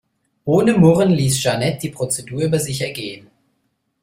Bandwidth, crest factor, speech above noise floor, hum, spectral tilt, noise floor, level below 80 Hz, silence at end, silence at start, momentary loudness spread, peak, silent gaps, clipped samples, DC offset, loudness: 16 kHz; 16 dB; 52 dB; none; -5.5 dB/octave; -69 dBFS; -50 dBFS; 0.85 s; 0.45 s; 16 LU; -2 dBFS; none; under 0.1%; under 0.1%; -17 LUFS